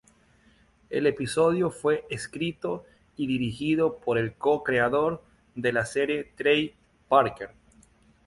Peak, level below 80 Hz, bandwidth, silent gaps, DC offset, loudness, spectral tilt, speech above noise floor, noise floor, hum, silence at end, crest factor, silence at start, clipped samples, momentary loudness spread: -6 dBFS; -58 dBFS; 11.5 kHz; none; under 0.1%; -26 LUFS; -5.5 dB/octave; 35 dB; -61 dBFS; none; 0.8 s; 20 dB; 0.9 s; under 0.1%; 12 LU